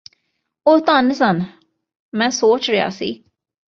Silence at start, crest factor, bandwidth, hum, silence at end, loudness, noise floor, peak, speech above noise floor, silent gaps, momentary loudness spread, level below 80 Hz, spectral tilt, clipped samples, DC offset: 0.65 s; 16 dB; 7.6 kHz; none; 0.55 s; -17 LUFS; -66 dBFS; -2 dBFS; 50 dB; 1.99-2.12 s; 14 LU; -62 dBFS; -4.5 dB/octave; under 0.1%; under 0.1%